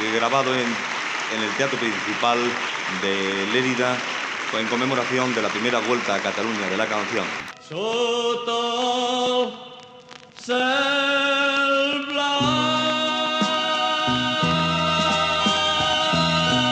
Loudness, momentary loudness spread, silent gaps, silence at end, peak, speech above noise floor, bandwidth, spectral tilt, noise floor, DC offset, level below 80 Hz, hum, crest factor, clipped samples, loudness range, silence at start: -21 LUFS; 6 LU; none; 0 s; -6 dBFS; 22 dB; 9.8 kHz; -3.5 dB/octave; -44 dBFS; under 0.1%; -54 dBFS; none; 16 dB; under 0.1%; 3 LU; 0 s